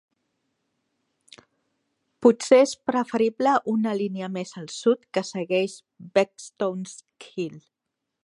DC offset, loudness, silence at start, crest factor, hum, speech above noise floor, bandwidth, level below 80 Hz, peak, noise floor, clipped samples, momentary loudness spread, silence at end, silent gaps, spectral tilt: under 0.1%; -24 LUFS; 2.2 s; 22 dB; none; 59 dB; 11.5 kHz; -76 dBFS; -4 dBFS; -83 dBFS; under 0.1%; 16 LU; 0.65 s; none; -5 dB/octave